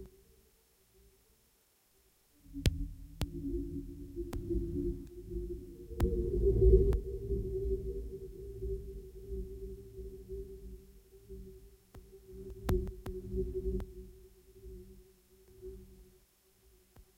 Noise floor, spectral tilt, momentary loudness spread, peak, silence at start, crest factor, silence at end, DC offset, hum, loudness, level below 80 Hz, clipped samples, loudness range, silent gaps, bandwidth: -71 dBFS; -8 dB/octave; 21 LU; -12 dBFS; 0 s; 24 dB; 0.15 s; under 0.1%; none; -37 LUFS; -40 dBFS; under 0.1%; 15 LU; none; 16 kHz